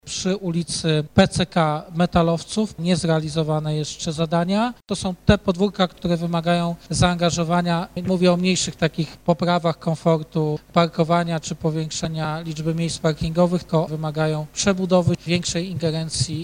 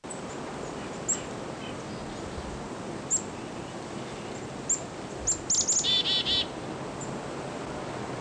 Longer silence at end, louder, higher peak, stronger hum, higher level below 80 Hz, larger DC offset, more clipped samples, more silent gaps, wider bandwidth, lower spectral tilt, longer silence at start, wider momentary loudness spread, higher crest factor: about the same, 0 s vs 0 s; first, -21 LUFS vs -30 LUFS; first, 0 dBFS vs -16 dBFS; neither; first, -42 dBFS vs -52 dBFS; neither; neither; neither; about the same, 10.5 kHz vs 11 kHz; first, -5.5 dB/octave vs -2 dB/octave; about the same, 0.05 s vs 0 s; second, 6 LU vs 15 LU; about the same, 20 dB vs 16 dB